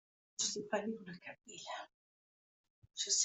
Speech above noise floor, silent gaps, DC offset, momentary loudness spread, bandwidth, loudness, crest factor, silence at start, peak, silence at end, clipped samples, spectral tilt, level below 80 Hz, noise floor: over 50 dB; 1.94-2.64 s, 2.70-2.82 s; under 0.1%; 15 LU; 8.2 kHz; -41 LUFS; 22 dB; 0.4 s; -20 dBFS; 0 s; under 0.1%; -1 dB/octave; -86 dBFS; under -90 dBFS